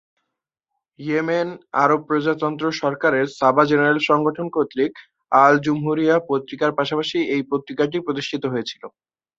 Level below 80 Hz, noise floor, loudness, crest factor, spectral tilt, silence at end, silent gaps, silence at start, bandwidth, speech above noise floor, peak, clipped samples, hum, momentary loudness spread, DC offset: -66 dBFS; -81 dBFS; -20 LUFS; 20 dB; -6 dB/octave; 0.5 s; none; 1 s; 7.6 kHz; 62 dB; 0 dBFS; under 0.1%; none; 9 LU; under 0.1%